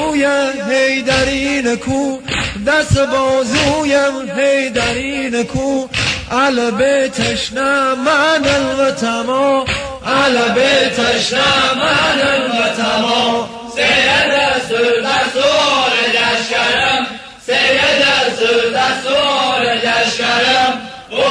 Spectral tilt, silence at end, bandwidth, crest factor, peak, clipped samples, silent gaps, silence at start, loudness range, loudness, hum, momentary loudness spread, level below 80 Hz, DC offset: -3.5 dB/octave; 0 s; 10.5 kHz; 14 dB; 0 dBFS; under 0.1%; none; 0 s; 3 LU; -13 LUFS; none; 6 LU; -40 dBFS; under 0.1%